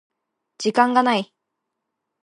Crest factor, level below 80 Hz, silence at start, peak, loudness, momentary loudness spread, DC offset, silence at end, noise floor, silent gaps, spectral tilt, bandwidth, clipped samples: 20 dB; -80 dBFS; 0.6 s; -2 dBFS; -20 LUFS; 11 LU; under 0.1%; 1 s; -80 dBFS; none; -4 dB/octave; 10.5 kHz; under 0.1%